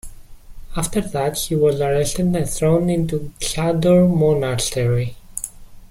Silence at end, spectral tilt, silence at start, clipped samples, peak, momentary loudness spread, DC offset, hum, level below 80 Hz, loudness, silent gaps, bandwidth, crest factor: 0.05 s; -5.5 dB/octave; 0.05 s; under 0.1%; -6 dBFS; 13 LU; under 0.1%; none; -36 dBFS; -19 LUFS; none; 16 kHz; 14 dB